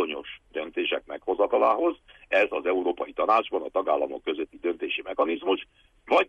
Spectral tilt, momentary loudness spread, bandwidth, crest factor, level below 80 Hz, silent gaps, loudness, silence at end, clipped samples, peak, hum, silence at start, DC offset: -4.5 dB/octave; 9 LU; 8 kHz; 16 dB; -62 dBFS; none; -27 LUFS; 0.05 s; under 0.1%; -10 dBFS; none; 0 s; under 0.1%